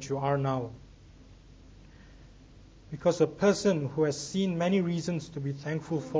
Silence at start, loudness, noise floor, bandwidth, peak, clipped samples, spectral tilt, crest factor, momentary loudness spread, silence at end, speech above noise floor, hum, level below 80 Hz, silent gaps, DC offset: 0 s; -29 LUFS; -53 dBFS; 8 kHz; -12 dBFS; under 0.1%; -6 dB/octave; 20 dB; 10 LU; 0 s; 24 dB; none; -56 dBFS; none; under 0.1%